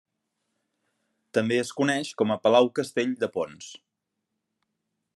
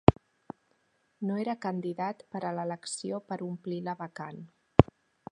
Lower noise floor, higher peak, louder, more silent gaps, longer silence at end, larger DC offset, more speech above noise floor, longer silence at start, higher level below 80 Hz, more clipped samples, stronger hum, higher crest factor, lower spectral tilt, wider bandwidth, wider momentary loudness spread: first, -82 dBFS vs -72 dBFS; second, -6 dBFS vs 0 dBFS; first, -25 LUFS vs -32 LUFS; neither; first, 1.4 s vs 0.5 s; neither; first, 57 dB vs 37 dB; first, 1.35 s vs 0.1 s; second, -78 dBFS vs -46 dBFS; neither; neither; second, 22 dB vs 30 dB; second, -5 dB/octave vs -7 dB/octave; first, 12.5 kHz vs 10.5 kHz; second, 13 LU vs 24 LU